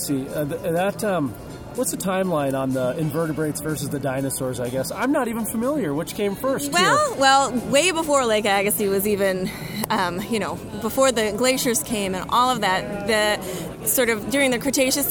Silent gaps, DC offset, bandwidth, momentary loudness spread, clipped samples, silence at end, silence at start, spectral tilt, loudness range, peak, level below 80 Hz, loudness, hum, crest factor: none; under 0.1%; over 20 kHz; 8 LU; under 0.1%; 0 s; 0 s; -3.5 dB/octave; 5 LU; -2 dBFS; -48 dBFS; -22 LUFS; none; 20 dB